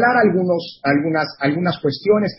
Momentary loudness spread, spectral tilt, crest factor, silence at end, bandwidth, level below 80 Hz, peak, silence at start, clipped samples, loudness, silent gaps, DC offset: 5 LU; -10.5 dB/octave; 14 dB; 0.05 s; 5.8 kHz; -58 dBFS; -4 dBFS; 0 s; under 0.1%; -18 LUFS; none; under 0.1%